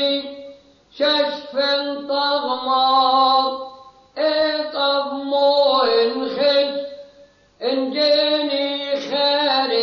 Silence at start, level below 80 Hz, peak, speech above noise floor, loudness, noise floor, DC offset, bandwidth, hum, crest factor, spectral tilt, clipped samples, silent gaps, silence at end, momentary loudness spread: 0 s; -66 dBFS; -6 dBFS; 32 dB; -18 LUFS; -50 dBFS; under 0.1%; 6.6 kHz; none; 14 dB; -3.5 dB/octave; under 0.1%; none; 0 s; 9 LU